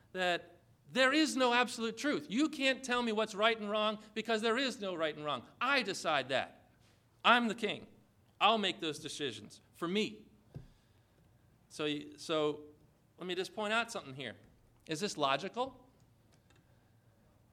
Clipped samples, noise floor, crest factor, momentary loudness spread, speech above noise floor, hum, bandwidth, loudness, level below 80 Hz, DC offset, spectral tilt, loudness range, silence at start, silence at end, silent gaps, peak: under 0.1%; -67 dBFS; 24 dB; 15 LU; 33 dB; none; 15.5 kHz; -34 LUFS; -74 dBFS; under 0.1%; -3.5 dB/octave; 8 LU; 0.15 s; 1.75 s; none; -12 dBFS